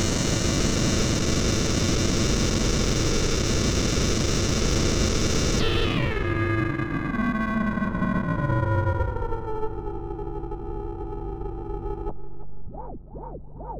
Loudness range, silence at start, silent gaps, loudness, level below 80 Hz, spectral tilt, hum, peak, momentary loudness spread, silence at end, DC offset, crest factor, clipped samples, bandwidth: 11 LU; 0 s; none; -25 LUFS; -30 dBFS; -4.5 dB/octave; none; -12 dBFS; 13 LU; 0 s; under 0.1%; 12 dB; under 0.1%; over 20 kHz